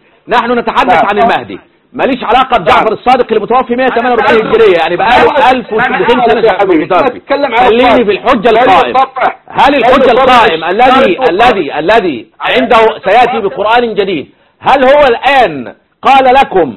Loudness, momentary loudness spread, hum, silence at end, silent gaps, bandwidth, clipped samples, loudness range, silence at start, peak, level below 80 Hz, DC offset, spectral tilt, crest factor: -7 LUFS; 7 LU; none; 0 s; none; 11.5 kHz; 2%; 3 LU; 0.3 s; 0 dBFS; -38 dBFS; 0.5%; -5.5 dB/octave; 8 dB